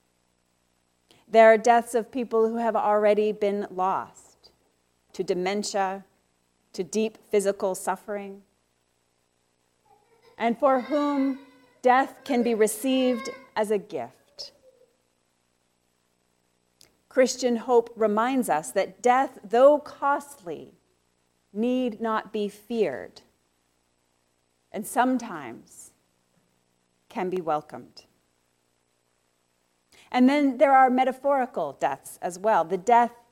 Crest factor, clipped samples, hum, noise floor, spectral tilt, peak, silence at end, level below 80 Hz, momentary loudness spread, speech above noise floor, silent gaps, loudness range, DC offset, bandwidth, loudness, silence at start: 20 dB; under 0.1%; 60 Hz at -60 dBFS; -71 dBFS; -4.5 dB/octave; -6 dBFS; 0.2 s; -74 dBFS; 19 LU; 47 dB; none; 12 LU; under 0.1%; 16 kHz; -24 LUFS; 1.35 s